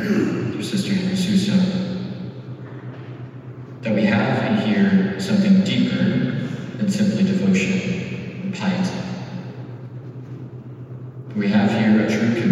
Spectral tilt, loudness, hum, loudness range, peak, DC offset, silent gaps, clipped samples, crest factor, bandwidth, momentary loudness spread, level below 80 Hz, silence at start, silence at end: -6.5 dB/octave; -20 LUFS; none; 7 LU; -4 dBFS; under 0.1%; none; under 0.1%; 16 dB; 11.5 kHz; 18 LU; -66 dBFS; 0 s; 0 s